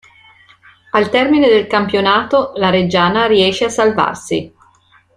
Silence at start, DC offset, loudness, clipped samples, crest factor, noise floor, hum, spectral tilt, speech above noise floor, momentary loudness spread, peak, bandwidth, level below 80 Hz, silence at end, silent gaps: 0.95 s; under 0.1%; -13 LUFS; under 0.1%; 14 dB; -51 dBFS; none; -5 dB/octave; 38 dB; 6 LU; 0 dBFS; 11 kHz; -50 dBFS; 0.7 s; none